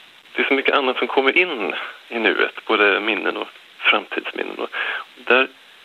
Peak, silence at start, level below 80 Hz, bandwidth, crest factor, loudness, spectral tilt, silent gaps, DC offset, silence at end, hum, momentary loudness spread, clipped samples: -2 dBFS; 0.35 s; -74 dBFS; 12.5 kHz; 18 dB; -19 LUFS; -4 dB/octave; none; under 0.1%; 0.35 s; none; 12 LU; under 0.1%